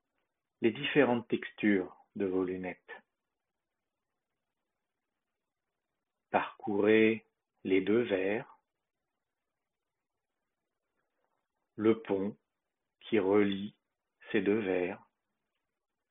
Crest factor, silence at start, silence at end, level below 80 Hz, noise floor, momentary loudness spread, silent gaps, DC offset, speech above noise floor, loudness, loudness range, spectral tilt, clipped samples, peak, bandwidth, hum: 22 dB; 0.6 s; 1.15 s; -76 dBFS; under -90 dBFS; 14 LU; none; under 0.1%; over 60 dB; -31 LUFS; 10 LU; -3 dB/octave; under 0.1%; -12 dBFS; 3.9 kHz; none